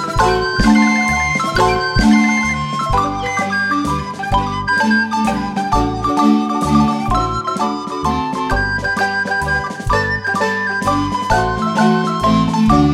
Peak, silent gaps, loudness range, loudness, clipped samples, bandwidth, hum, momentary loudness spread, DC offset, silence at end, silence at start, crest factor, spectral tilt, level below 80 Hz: 0 dBFS; none; 3 LU; -16 LUFS; under 0.1%; 13.5 kHz; none; 6 LU; under 0.1%; 0 s; 0 s; 14 dB; -5 dB/octave; -28 dBFS